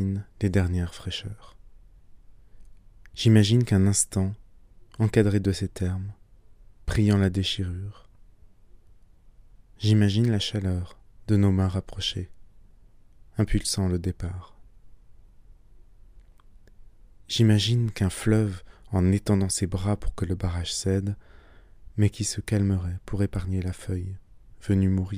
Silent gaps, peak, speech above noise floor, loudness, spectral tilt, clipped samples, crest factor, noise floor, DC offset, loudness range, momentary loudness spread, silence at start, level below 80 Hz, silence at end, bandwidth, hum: none; -6 dBFS; 28 dB; -25 LUFS; -5.5 dB/octave; under 0.1%; 20 dB; -52 dBFS; under 0.1%; 7 LU; 16 LU; 0 s; -42 dBFS; 0 s; 15.5 kHz; none